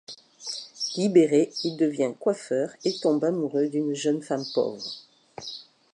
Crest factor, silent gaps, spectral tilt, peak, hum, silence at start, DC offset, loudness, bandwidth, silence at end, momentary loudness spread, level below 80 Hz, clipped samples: 20 dB; none; -5 dB/octave; -6 dBFS; none; 0.1 s; under 0.1%; -26 LUFS; 11 kHz; 0.3 s; 17 LU; -78 dBFS; under 0.1%